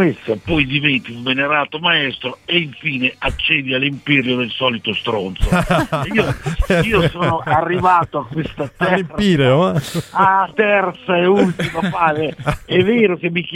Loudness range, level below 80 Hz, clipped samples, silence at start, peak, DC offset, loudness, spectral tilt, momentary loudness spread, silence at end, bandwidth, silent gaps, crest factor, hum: 2 LU; -32 dBFS; under 0.1%; 0 s; 0 dBFS; under 0.1%; -16 LUFS; -6 dB/octave; 7 LU; 0 s; 16 kHz; none; 16 dB; none